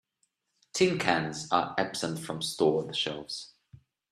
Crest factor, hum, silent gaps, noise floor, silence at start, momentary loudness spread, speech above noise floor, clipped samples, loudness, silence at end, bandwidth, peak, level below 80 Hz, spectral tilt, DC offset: 26 dB; none; none; -77 dBFS; 0.75 s; 11 LU; 48 dB; under 0.1%; -29 LUFS; 0.35 s; 14 kHz; -6 dBFS; -68 dBFS; -4 dB/octave; under 0.1%